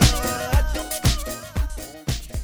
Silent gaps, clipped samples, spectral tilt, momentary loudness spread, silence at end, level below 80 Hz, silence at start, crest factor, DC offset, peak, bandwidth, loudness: none; under 0.1%; -4 dB/octave; 7 LU; 0 s; -26 dBFS; 0 s; 18 dB; under 0.1%; -4 dBFS; over 20 kHz; -24 LUFS